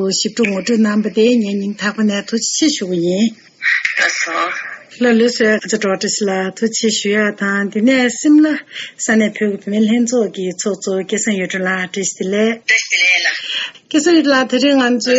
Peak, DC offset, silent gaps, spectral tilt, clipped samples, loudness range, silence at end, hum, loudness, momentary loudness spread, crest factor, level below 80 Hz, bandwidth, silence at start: -2 dBFS; under 0.1%; none; -3.5 dB/octave; under 0.1%; 2 LU; 0 s; none; -15 LUFS; 8 LU; 14 dB; -64 dBFS; 8.2 kHz; 0 s